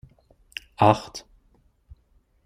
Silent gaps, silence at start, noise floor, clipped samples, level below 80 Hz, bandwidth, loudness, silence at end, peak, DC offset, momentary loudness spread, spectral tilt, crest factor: none; 0.8 s; -63 dBFS; under 0.1%; -56 dBFS; 14.5 kHz; -21 LUFS; 1.25 s; -2 dBFS; under 0.1%; 20 LU; -6 dB/octave; 26 dB